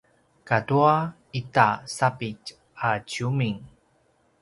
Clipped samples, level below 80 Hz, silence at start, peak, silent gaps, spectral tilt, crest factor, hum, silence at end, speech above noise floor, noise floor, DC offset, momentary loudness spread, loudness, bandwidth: under 0.1%; -60 dBFS; 0.45 s; -2 dBFS; none; -6 dB/octave; 24 dB; none; 0.75 s; 41 dB; -65 dBFS; under 0.1%; 14 LU; -24 LUFS; 11.5 kHz